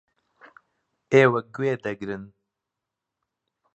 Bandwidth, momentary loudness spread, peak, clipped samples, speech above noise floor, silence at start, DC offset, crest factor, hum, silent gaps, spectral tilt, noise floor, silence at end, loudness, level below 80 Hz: 8.2 kHz; 16 LU; -2 dBFS; under 0.1%; 63 dB; 1.1 s; under 0.1%; 24 dB; none; none; -7 dB/octave; -85 dBFS; 1.5 s; -22 LUFS; -68 dBFS